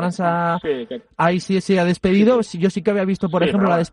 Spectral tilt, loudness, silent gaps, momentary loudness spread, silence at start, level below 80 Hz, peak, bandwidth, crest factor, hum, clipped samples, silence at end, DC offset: -7 dB/octave; -18 LUFS; none; 6 LU; 0 s; -50 dBFS; -4 dBFS; 10.5 kHz; 14 dB; none; under 0.1%; 0.05 s; under 0.1%